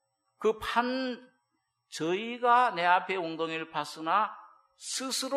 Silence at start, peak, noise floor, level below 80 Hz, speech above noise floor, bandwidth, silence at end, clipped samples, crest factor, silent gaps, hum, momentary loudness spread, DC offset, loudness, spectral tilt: 0.4 s; -10 dBFS; -80 dBFS; -68 dBFS; 50 dB; 15 kHz; 0 s; under 0.1%; 20 dB; none; none; 12 LU; under 0.1%; -29 LUFS; -2.5 dB/octave